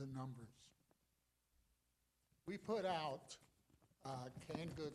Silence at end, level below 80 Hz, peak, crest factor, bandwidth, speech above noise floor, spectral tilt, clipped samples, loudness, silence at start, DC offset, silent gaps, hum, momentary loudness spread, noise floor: 0 s; -78 dBFS; -30 dBFS; 20 dB; 14 kHz; 38 dB; -5.5 dB/octave; under 0.1%; -48 LUFS; 0 s; under 0.1%; none; 60 Hz at -85 dBFS; 17 LU; -85 dBFS